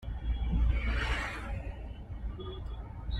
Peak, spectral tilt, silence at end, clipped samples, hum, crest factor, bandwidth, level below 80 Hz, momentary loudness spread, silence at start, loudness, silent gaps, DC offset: -18 dBFS; -6 dB/octave; 0 s; under 0.1%; none; 16 dB; 8.8 kHz; -34 dBFS; 12 LU; 0 s; -36 LUFS; none; under 0.1%